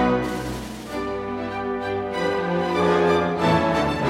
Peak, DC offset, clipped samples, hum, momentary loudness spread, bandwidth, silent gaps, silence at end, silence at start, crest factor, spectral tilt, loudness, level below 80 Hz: -6 dBFS; under 0.1%; under 0.1%; none; 10 LU; 16 kHz; none; 0 s; 0 s; 16 dB; -6 dB/octave; -23 LUFS; -44 dBFS